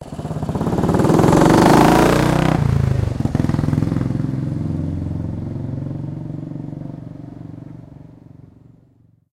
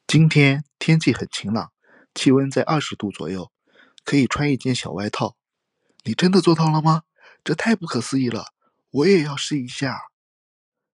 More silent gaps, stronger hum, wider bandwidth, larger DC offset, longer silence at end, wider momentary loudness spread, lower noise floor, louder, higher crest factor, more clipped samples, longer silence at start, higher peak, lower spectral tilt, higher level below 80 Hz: neither; neither; first, 16.5 kHz vs 11 kHz; neither; first, 1.3 s vs 0.9 s; first, 22 LU vs 15 LU; second, -54 dBFS vs -76 dBFS; first, -17 LUFS vs -20 LUFS; about the same, 18 dB vs 18 dB; neither; about the same, 0 s vs 0.1 s; about the same, 0 dBFS vs -2 dBFS; about the same, -7 dB/octave vs -6 dB/octave; first, -34 dBFS vs -56 dBFS